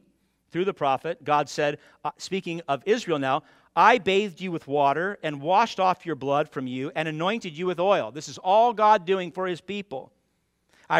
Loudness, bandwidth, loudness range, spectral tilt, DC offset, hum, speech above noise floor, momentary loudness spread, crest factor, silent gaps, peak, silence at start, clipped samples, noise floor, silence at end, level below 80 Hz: -25 LUFS; 12.5 kHz; 3 LU; -5 dB/octave; under 0.1%; none; 47 dB; 13 LU; 22 dB; none; -2 dBFS; 0.55 s; under 0.1%; -72 dBFS; 0 s; -70 dBFS